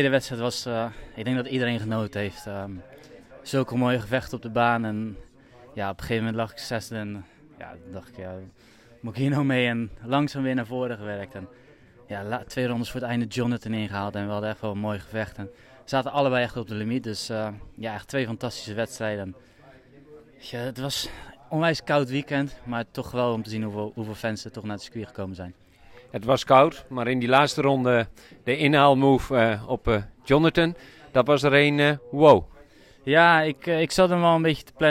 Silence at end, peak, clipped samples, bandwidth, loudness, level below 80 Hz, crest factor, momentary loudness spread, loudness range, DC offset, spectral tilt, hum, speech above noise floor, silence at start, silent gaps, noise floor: 0 s; -4 dBFS; under 0.1%; 16 kHz; -24 LUFS; -50 dBFS; 22 dB; 18 LU; 11 LU; under 0.1%; -6 dB/octave; none; 27 dB; 0 s; none; -52 dBFS